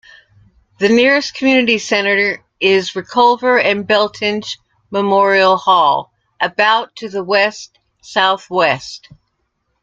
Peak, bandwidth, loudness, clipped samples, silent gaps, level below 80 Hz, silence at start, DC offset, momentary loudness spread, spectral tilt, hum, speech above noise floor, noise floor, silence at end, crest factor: 0 dBFS; 7.8 kHz; -14 LUFS; under 0.1%; none; -60 dBFS; 0.8 s; under 0.1%; 12 LU; -4 dB/octave; none; 54 dB; -68 dBFS; 0.85 s; 14 dB